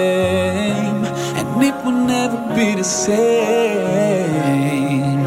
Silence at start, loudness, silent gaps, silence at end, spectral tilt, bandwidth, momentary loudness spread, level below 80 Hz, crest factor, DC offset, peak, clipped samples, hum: 0 s; -17 LUFS; none; 0 s; -5 dB/octave; 16.5 kHz; 4 LU; -52 dBFS; 14 dB; under 0.1%; -2 dBFS; under 0.1%; none